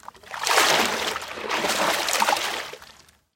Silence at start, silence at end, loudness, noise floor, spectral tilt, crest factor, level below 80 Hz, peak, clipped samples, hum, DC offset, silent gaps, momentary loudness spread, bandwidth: 0.15 s; 0.5 s; -22 LUFS; -52 dBFS; -0.5 dB/octave; 22 dB; -62 dBFS; -2 dBFS; under 0.1%; none; under 0.1%; none; 15 LU; 16.5 kHz